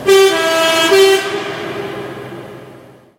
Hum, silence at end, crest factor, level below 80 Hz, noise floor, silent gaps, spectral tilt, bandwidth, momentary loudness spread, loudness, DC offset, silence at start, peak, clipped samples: none; 0.4 s; 14 dB; -56 dBFS; -40 dBFS; none; -2.5 dB/octave; 16.5 kHz; 20 LU; -12 LUFS; under 0.1%; 0 s; 0 dBFS; under 0.1%